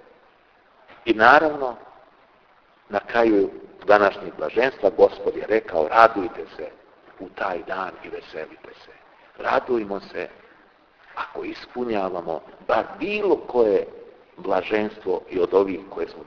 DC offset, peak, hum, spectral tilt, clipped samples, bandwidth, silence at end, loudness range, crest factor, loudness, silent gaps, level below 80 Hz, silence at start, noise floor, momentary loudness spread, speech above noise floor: under 0.1%; 0 dBFS; none; -6 dB/octave; under 0.1%; 5.4 kHz; 0.05 s; 9 LU; 24 dB; -22 LUFS; none; -56 dBFS; 0.9 s; -57 dBFS; 18 LU; 35 dB